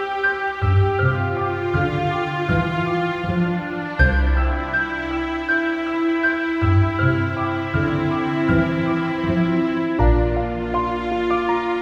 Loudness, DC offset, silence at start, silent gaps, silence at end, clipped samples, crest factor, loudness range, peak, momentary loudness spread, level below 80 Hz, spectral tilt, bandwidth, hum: -20 LUFS; under 0.1%; 0 s; none; 0 s; under 0.1%; 16 dB; 1 LU; -4 dBFS; 5 LU; -28 dBFS; -8.5 dB/octave; 7.4 kHz; none